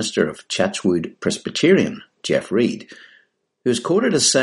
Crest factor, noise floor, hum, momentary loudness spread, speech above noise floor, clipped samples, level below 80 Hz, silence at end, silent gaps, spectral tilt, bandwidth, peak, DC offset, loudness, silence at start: 18 dB; -58 dBFS; none; 9 LU; 39 dB; under 0.1%; -60 dBFS; 0 s; none; -3.5 dB/octave; 11.5 kHz; -2 dBFS; under 0.1%; -20 LUFS; 0 s